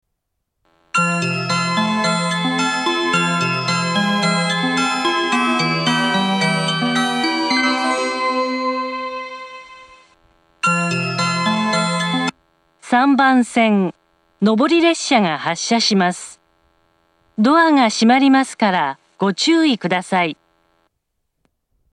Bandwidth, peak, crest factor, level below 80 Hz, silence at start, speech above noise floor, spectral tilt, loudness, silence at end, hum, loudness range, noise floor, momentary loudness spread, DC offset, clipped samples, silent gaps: 12 kHz; 0 dBFS; 18 dB; -66 dBFS; 0.95 s; 60 dB; -4 dB/octave; -17 LUFS; 1.6 s; none; 5 LU; -75 dBFS; 8 LU; under 0.1%; under 0.1%; none